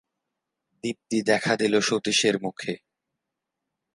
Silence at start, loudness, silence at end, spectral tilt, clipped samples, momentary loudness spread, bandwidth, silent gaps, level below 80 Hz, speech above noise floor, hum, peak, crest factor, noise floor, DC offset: 0.85 s; -24 LUFS; 1.2 s; -3.5 dB/octave; under 0.1%; 12 LU; 11.5 kHz; none; -70 dBFS; 60 dB; none; -6 dBFS; 20 dB; -84 dBFS; under 0.1%